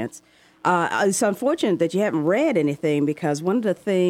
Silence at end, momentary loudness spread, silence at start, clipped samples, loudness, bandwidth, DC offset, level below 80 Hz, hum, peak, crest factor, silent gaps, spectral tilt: 0 s; 3 LU; 0 s; under 0.1%; -22 LUFS; 16 kHz; under 0.1%; -70 dBFS; none; -8 dBFS; 14 dB; none; -5.5 dB/octave